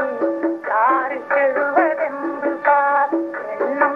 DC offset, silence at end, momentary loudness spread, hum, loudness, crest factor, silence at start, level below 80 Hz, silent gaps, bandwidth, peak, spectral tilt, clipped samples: under 0.1%; 0 s; 7 LU; none; -19 LUFS; 16 dB; 0 s; -78 dBFS; none; 5.4 kHz; -2 dBFS; -6.5 dB/octave; under 0.1%